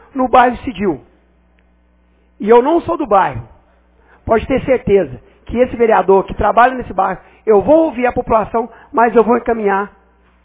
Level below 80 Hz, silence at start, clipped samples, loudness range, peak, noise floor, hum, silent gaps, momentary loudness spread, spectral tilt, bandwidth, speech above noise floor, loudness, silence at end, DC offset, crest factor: -38 dBFS; 0.15 s; under 0.1%; 3 LU; 0 dBFS; -53 dBFS; none; none; 10 LU; -10.5 dB/octave; 4 kHz; 40 dB; -14 LUFS; 0.55 s; under 0.1%; 14 dB